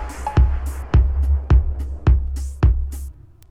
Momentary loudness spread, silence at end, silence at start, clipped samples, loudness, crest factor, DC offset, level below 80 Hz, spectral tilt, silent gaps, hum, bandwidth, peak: 10 LU; 0.4 s; 0 s; under 0.1%; -20 LUFS; 14 dB; under 0.1%; -18 dBFS; -7.5 dB/octave; none; none; 10.5 kHz; -4 dBFS